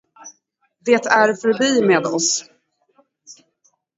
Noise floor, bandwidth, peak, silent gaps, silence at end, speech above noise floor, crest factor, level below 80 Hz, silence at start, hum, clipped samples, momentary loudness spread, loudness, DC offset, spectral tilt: -66 dBFS; 8 kHz; 0 dBFS; none; 0.65 s; 50 dB; 20 dB; -70 dBFS; 0.25 s; none; under 0.1%; 5 LU; -17 LUFS; under 0.1%; -3 dB/octave